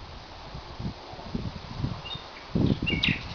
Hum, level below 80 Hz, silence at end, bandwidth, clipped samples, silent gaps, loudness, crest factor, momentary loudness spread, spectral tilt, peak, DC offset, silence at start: none; -42 dBFS; 0 s; 5.4 kHz; under 0.1%; none; -31 LUFS; 22 dB; 16 LU; -6 dB/octave; -10 dBFS; under 0.1%; 0 s